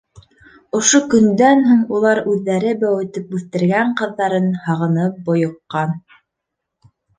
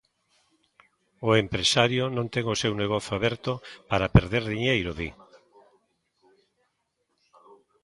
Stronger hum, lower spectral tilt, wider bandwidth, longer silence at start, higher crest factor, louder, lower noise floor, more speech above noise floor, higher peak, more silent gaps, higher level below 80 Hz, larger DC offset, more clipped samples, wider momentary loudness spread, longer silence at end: neither; about the same, -5 dB/octave vs -5 dB/octave; second, 10 kHz vs 11.5 kHz; second, 0.15 s vs 1.2 s; second, 16 dB vs 26 dB; first, -16 LUFS vs -25 LUFS; about the same, -79 dBFS vs -76 dBFS; first, 63 dB vs 51 dB; about the same, 0 dBFS vs -2 dBFS; neither; second, -58 dBFS vs -44 dBFS; neither; neither; about the same, 11 LU vs 11 LU; second, 1.2 s vs 2.7 s